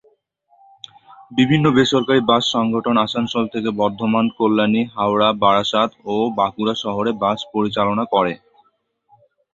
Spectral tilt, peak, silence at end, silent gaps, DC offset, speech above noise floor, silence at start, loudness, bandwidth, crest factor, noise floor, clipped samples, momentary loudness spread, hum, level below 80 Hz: -6 dB/octave; -2 dBFS; 1.2 s; none; under 0.1%; 46 dB; 1.1 s; -18 LUFS; 7.8 kHz; 18 dB; -63 dBFS; under 0.1%; 7 LU; none; -56 dBFS